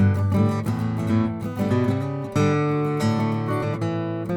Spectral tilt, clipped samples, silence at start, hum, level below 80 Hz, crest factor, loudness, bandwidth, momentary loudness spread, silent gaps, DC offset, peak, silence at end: -8 dB/octave; under 0.1%; 0 s; none; -52 dBFS; 12 dB; -23 LUFS; 16 kHz; 5 LU; none; under 0.1%; -10 dBFS; 0 s